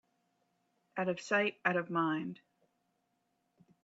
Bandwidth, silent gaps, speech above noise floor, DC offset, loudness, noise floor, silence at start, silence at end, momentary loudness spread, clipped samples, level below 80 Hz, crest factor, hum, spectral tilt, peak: 8 kHz; none; 46 dB; under 0.1%; -34 LUFS; -80 dBFS; 0.95 s; 1.5 s; 13 LU; under 0.1%; -86 dBFS; 20 dB; none; -5.5 dB/octave; -18 dBFS